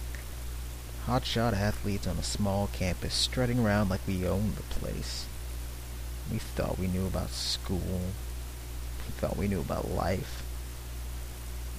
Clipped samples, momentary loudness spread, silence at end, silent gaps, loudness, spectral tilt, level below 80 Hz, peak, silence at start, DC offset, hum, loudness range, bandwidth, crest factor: under 0.1%; 12 LU; 0 s; none; -33 LUFS; -5 dB/octave; -38 dBFS; -14 dBFS; 0 s; under 0.1%; none; 5 LU; 15.5 kHz; 18 dB